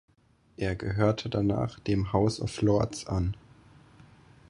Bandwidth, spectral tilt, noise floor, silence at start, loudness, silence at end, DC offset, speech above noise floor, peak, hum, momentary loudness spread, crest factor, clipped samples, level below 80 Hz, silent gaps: 11 kHz; -7 dB/octave; -64 dBFS; 0.6 s; -29 LUFS; 1.15 s; under 0.1%; 36 dB; -10 dBFS; none; 7 LU; 20 dB; under 0.1%; -46 dBFS; none